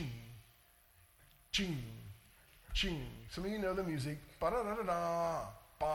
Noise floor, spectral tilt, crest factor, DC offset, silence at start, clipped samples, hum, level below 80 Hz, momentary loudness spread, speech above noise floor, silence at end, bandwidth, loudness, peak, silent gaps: -67 dBFS; -5 dB/octave; 18 dB; under 0.1%; 0 s; under 0.1%; none; -52 dBFS; 16 LU; 29 dB; 0 s; 19.5 kHz; -39 LUFS; -22 dBFS; none